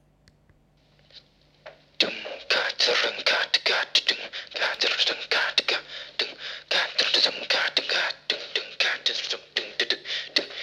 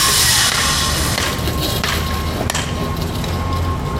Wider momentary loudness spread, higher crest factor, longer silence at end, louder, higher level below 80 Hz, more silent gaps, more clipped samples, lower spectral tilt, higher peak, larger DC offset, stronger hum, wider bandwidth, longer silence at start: about the same, 8 LU vs 10 LU; first, 22 dB vs 16 dB; about the same, 0 s vs 0 s; second, -24 LUFS vs -17 LUFS; second, -72 dBFS vs -26 dBFS; neither; neither; second, 0 dB/octave vs -2.5 dB/octave; second, -6 dBFS vs -2 dBFS; neither; neither; second, 14.5 kHz vs 17 kHz; first, 1.15 s vs 0 s